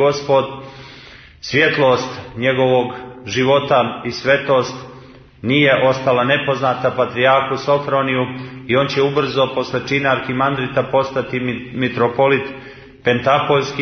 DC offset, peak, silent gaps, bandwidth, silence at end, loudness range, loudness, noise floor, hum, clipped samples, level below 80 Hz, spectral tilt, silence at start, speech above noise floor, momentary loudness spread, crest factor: under 0.1%; 0 dBFS; none; 6.6 kHz; 0 s; 2 LU; -17 LUFS; -41 dBFS; none; under 0.1%; -52 dBFS; -5.5 dB/octave; 0 s; 24 dB; 13 LU; 16 dB